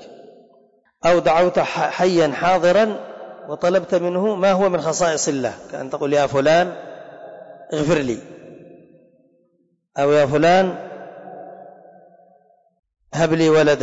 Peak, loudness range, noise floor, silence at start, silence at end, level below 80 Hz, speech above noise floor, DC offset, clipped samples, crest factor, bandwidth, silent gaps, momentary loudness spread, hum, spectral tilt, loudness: -8 dBFS; 5 LU; -65 dBFS; 0 s; 0 s; -54 dBFS; 48 dB; under 0.1%; under 0.1%; 12 dB; 8 kHz; 12.79-12.83 s; 22 LU; none; -5 dB/octave; -18 LUFS